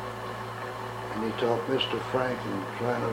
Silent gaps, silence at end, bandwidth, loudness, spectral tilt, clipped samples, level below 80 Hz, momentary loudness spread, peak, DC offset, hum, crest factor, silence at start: none; 0 s; 16 kHz; -31 LUFS; -5.5 dB/octave; under 0.1%; -58 dBFS; 9 LU; -12 dBFS; under 0.1%; none; 18 dB; 0 s